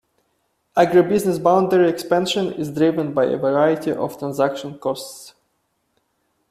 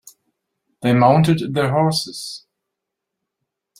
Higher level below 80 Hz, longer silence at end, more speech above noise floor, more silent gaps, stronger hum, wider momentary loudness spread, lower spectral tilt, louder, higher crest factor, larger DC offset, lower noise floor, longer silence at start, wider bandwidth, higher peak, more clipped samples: about the same, -60 dBFS vs -56 dBFS; second, 1.2 s vs 1.4 s; second, 51 dB vs 64 dB; neither; neither; second, 11 LU vs 17 LU; about the same, -6 dB/octave vs -6 dB/octave; about the same, -19 LUFS vs -17 LUFS; about the same, 18 dB vs 20 dB; neither; second, -70 dBFS vs -81 dBFS; about the same, 0.75 s vs 0.8 s; about the same, 14.5 kHz vs 15 kHz; about the same, -2 dBFS vs -2 dBFS; neither